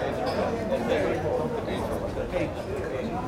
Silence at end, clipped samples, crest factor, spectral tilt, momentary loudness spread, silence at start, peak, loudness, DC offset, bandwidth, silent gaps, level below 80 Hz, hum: 0 s; under 0.1%; 16 dB; -6.5 dB/octave; 5 LU; 0 s; -12 dBFS; -29 LUFS; under 0.1%; 16.5 kHz; none; -44 dBFS; none